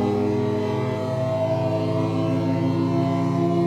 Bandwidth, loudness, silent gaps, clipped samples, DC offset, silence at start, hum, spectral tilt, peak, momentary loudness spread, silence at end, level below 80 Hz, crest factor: 10.5 kHz; -23 LUFS; none; under 0.1%; under 0.1%; 0 s; none; -8.5 dB/octave; -10 dBFS; 3 LU; 0 s; -54 dBFS; 12 dB